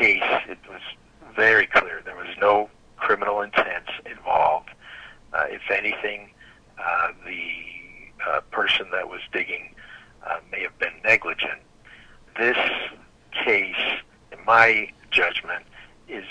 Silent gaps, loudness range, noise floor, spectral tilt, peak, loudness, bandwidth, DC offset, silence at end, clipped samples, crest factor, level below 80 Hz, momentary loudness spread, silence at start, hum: none; 6 LU; -51 dBFS; -3.5 dB/octave; -4 dBFS; -22 LUFS; 10 kHz; under 0.1%; 0 s; under 0.1%; 22 dB; -56 dBFS; 20 LU; 0 s; none